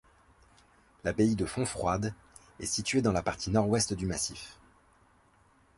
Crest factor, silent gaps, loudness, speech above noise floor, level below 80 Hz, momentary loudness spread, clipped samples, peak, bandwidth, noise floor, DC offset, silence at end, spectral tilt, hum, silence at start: 20 dB; none; -31 LUFS; 34 dB; -52 dBFS; 11 LU; under 0.1%; -12 dBFS; 11.5 kHz; -64 dBFS; under 0.1%; 1.25 s; -4.5 dB/octave; none; 1.05 s